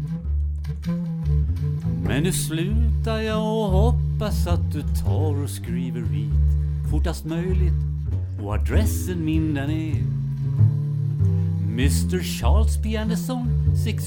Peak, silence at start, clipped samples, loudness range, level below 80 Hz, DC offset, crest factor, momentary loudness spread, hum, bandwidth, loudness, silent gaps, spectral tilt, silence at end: -6 dBFS; 0 s; under 0.1%; 2 LU; -26 dBFS; under 0.1%; 14 dB; 6 LU; none; 18 kHz; -23 LUFS; none; -6.5 dB/octave; 0 s